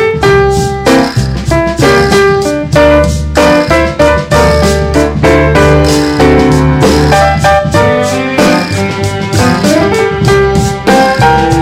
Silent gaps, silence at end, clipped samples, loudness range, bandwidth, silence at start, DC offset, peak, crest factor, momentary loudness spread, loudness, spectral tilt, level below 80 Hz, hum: none; 0 s; 1%; 2 LU; 16.5 kHz; 0 s; under 0.1%; 0 dBFS; 8 dB; 5 LU; -8 LUFS; -5.5 dB/octave; -20 dBFS; none